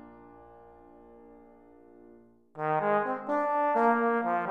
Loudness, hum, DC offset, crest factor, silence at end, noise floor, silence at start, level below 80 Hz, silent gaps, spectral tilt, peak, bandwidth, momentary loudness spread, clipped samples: -28 LUFS; none; under 0.1%; 18 dB; 0 s; -57 dBFS; 0.05 s; -72 dBFS; none; -8 dB/octave; -14 dBFS; 8.2 kHz; 7 LU; under 0.1%